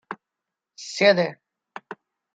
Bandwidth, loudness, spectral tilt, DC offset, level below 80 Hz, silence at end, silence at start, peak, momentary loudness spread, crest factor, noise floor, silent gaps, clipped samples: 9 kHz; -21 LUFS; -4 dB/octave; under 0.1%; -78 dBFS; 0.4 s; 0.1 s; -4 dBFS; 25 LU; 22 dB; -86 dBFS; none; under 0.1%